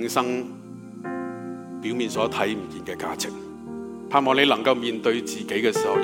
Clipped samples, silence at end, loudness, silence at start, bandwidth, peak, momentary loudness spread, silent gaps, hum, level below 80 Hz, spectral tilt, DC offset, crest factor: under 0.1%; 0 s; -24 LUFS; 0 s; 17 kHz; -4 dBFS; 17 LU; none; none; -64 dBFS; -4 dB/octave; under 0.1%; 22 dB